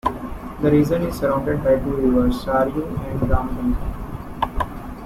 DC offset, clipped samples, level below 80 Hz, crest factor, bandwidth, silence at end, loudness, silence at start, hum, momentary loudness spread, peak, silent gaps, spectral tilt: under 0.1%; under 0.1%; -30 dBFS; 16 dB; 16 kHz; 0 s; -21 LUFS; 0.05 s; none; 12 LU; -4 dBFS; none; -8 dB/octave